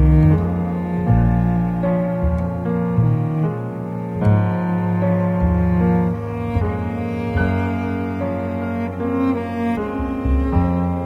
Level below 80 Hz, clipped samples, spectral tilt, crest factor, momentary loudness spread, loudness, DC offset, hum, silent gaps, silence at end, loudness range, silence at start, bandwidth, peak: -28 dBFS; under 0.1%; -10.5 dB/octave; 14 dB; 7 LU; -20 LUFS; under 0.1%; none; none; 0 s; 3 LU; 0 s; 4.7 kHz; -4 dBFS